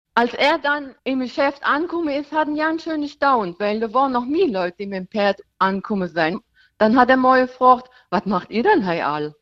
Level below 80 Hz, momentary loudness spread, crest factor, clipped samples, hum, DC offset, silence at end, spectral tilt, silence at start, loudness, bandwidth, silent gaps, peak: -58 dBFS; 9 LU; 18 dB; under 0.1%; none; under 0.1%; 0.1 s; -6.5 dB/octave; 0.15 s; -20 LUFS; 7.8 kHz; none; -2 dBFS